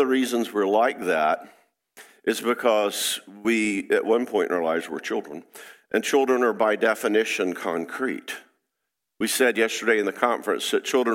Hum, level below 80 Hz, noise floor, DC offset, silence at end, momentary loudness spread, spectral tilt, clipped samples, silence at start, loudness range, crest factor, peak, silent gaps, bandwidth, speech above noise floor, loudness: none; -76 dBFS; -82 dBFS; under 0.1%; 0 s; 9 LU; -3 dB/octave; under 0.1%; 0 s; 1 LU; 20 dB; -4 dBFS; none; 16.5 kHz; 59 dB; -24 LUFS